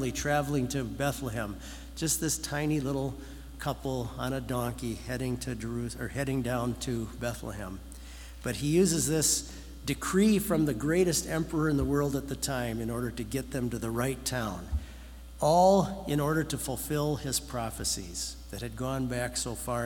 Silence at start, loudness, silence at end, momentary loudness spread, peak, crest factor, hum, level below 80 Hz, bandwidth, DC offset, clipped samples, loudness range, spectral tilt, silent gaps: 0 s; -30 LUFS; 0 s; 13 LU; -12 dBFS; 20 dB; none; -44 dBFS; 18 kHz; under 0.1%; under 0.1%; 6 LU; -4.5 dB/octave; none